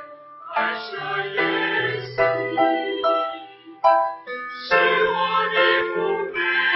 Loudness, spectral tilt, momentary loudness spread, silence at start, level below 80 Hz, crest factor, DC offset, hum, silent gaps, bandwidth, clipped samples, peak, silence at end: -21 LUFS; -6 dB/octave; 11 LU; 0 s; -62 dBFS; 18 dB; under 0.1%; none; none; 6 kHz; under 0.1%; -4 dBFS; 0 s